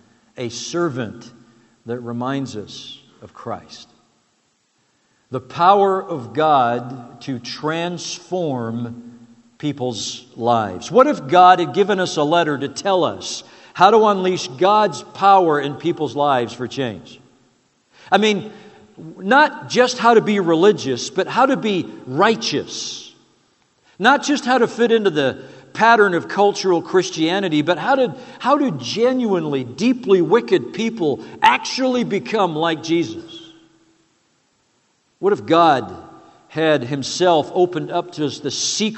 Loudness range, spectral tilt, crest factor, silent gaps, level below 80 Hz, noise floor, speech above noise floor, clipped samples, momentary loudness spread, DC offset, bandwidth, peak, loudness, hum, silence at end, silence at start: 9 LU; -4.5 dB/octave; 18 dB; none; -68 dBFS; -64 dBFS; 46 dB; under 0.1%; 16 LU; under 0.1%; 8.4 kHz; 0 dBFS; -18 LUFS; none; 0 s; 0.4 s